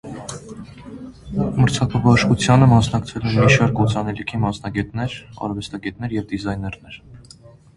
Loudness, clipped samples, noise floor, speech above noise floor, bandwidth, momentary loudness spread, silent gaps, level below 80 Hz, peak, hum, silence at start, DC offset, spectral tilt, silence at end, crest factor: -19 LUFS; under 0.1%; -46 dBFS; 27 dB; 11.5 kHz; 22 LU; none; -40 dBFS; 0 dBFS; none; 0.05 s; under 0.1%; -6 dB/octave; 0.55 s; 20 dB